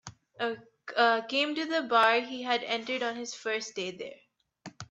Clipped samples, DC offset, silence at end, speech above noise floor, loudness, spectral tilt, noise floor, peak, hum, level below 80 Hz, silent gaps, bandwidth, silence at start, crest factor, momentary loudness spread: under 0.1%; under 0.1%; 0.05 s; 22 dB; -29 LUFS; -2.5 dB/octave; -51 dBFS; -10 dBFS; none; -78 dBFS; none; 10 kHz; 0.05 s; 20 dB; 18 LU